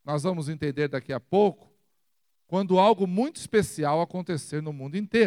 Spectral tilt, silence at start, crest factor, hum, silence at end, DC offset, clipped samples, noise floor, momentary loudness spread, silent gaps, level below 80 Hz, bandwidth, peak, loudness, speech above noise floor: -6 dB/octave; 0.05 s; 18 dB; none; 0 s; under 0.1%; under 0.1%; -79 dBFS; 12 LU; none; -64 dBFS; 15 kHz; -8 dBFS; -26 LUFS; 54 dB